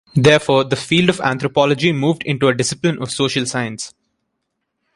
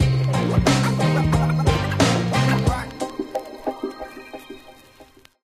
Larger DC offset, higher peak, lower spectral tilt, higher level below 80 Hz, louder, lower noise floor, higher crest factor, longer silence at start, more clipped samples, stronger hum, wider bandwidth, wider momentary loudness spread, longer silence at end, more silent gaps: neither; first, 0 dBFS vs -4 dBFS; about the same, -5 dB/octave vs -6 dB/octave; second, -52 dBFS vs -34 dBFS; first, -16 LUFS vs -21 LUFS; first, -74 dBFS vs -50 dBFS; about the same, 16 dB vs 18 dB; first, 0.15 s vs 0 s; neither; neither; second, 11.5 kHz vs 15 kHz; second, 9 LU vs 19 LU; first, 1.05 s vs 0.4 s; neither